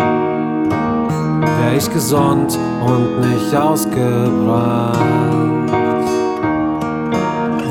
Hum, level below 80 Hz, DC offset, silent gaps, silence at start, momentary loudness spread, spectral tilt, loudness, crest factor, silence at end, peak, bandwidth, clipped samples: none; -46 dBFS; under 0.1%; none; 0 s; 3 LU; -6.5 dB/octave; -16 LUFS; 14 dB; 0 s; -2 dBFS; 17.5 kHz; under 0.1%